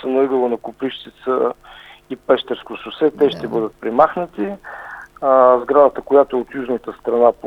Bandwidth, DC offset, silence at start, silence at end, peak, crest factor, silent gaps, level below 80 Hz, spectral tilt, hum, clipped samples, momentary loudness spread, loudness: 6 kHz; under 0.1%; 0 s; 0 s; 0 dBFS; 18 dB; none; -54 dBFS; -7 dB/octave; 50 Hz at -60 dBFS; under 0.1%; 18 LU; -17 LUFS